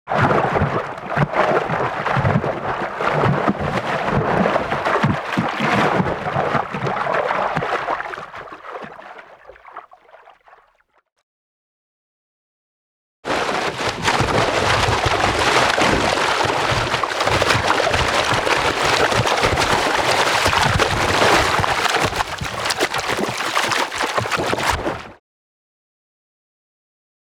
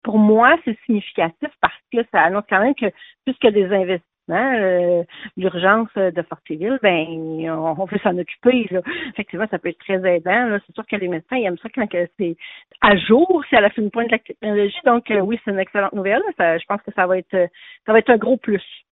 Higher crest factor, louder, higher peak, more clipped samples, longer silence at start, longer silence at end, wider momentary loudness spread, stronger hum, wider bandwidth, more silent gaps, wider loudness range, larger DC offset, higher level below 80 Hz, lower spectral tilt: about the same, 18 dB vs 18 dB; about the same, -18 LUFS vs -19 LUFS; about the same, -2 dBFS vs 0 dBFS; neither; about the same, 0.05 s vs 0.05 s; first, 2.1 s vs 0.15 s; second, 8 LU vs 11 LU; neither; first, over 20 kHz vs 4.1 kHz; first, 11.12-11.16 s, 11.23-13.23 s vs none; first, 9 LU vs 4 LU; neither; first, -40 dBFS vs -56 dBFS; second, -4 dB/octave vs -10.5 dB/octave